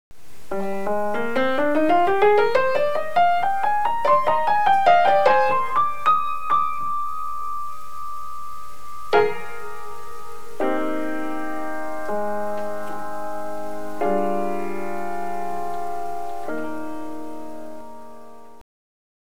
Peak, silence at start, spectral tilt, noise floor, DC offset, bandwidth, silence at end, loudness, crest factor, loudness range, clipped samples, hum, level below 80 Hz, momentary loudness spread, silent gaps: -4 dBFS; 0.1 s; -5 dB/octave; -45 dBFS; 6%; over 20 kHz; 0.7 s; -22 LUFS; 18 dB; 12 LU; under 0.1%; none; -56 dBFS; 19 LU; none